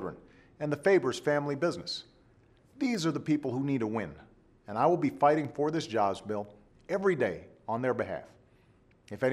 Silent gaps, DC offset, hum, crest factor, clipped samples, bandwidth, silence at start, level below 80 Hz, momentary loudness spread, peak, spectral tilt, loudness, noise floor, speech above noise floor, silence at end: none; under 0.1%; none; 20 dB; under 0.1%; 13 kHz; 0 s; -66 dBFS; 13 LU; -12 dBFS; -6 dB/octave; -31 LUFS; -63 dBFS; 33 dB; 0 s